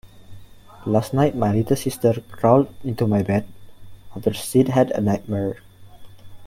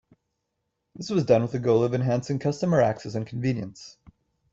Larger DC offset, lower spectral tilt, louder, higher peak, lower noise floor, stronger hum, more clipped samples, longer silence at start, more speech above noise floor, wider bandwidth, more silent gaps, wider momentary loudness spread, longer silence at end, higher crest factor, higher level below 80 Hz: neither; about the same, -7 dB/octave vs -7.5 dB/octave; first, -21 LUFS vs -25 LUFS; first, -2 dBFS vs -8 dBFS; second, -42 dBFS vs -79 dBFS; neither; neither; second, 0.05 s vs 1 s; second, 22 dB vs 55 dB; first, 16.5 kHz vs 7.8 kHz; neither; about the same, 9 LU vs 10 LU; second, 0 s vs 0.6 s; about the same, 20 dB vs 18 dB; first, -50 dBFS vs -60 dBFS